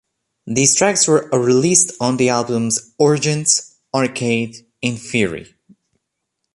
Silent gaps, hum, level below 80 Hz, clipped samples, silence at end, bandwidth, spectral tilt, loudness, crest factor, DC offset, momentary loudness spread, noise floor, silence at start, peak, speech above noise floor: none; none; -56 dBFS; under 0.1%; 1.1 s; 11.5 kHz; -3.5 dB/octave; -16 LUFS; 18 dB; under 0.1%; 11 LU; -76 dBFS; 0.45 s; 0 dBFS; 59 dB